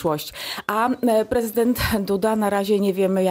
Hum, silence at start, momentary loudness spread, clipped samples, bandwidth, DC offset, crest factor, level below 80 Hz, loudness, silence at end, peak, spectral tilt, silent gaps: none; 0 s; 6 LU; under 0.1%; 16 kHz; under 0.1%; 14 dB; -44 dBFS; -21 LUFS; 0 s; -6 dBFS; -5.5 dB/octave; none